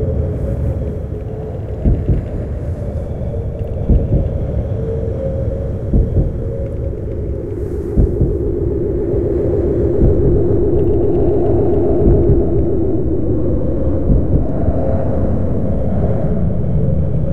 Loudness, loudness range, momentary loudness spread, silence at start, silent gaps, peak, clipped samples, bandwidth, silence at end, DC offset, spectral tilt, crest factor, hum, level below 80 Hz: -17 LUFS; 6 LU; 9 LU; 0 s; none; 0 dBFS; under 0.1%; 3.5 kHz; 0 s; under 0.1%; -12 dB/octave; 14 dB; none; -20 dBFS